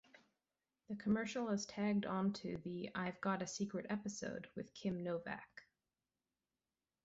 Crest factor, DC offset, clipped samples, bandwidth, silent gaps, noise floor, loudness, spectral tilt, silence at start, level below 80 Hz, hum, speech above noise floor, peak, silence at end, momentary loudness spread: 18 dB; under 0.1%; under 0.1%; 8 kHz; none; under -90 dBFS; -42 LUFS; -5.5 dB/octave; 0.9 s; -74 dBFS; none; over 48 dB; -24 dBFS; 1.45 s; 10 LU